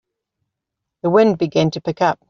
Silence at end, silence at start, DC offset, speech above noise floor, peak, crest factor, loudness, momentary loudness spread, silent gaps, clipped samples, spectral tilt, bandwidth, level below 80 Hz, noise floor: 0.15 s; 1.05 s; under 0.1%; 65 dB; -2 dBFS; 16 dB; -17 LUFS; 6 LU; none; under 0.1%; -5.5 dB/octave; 7.2 kHz; -58 dBFS; -81 dBFS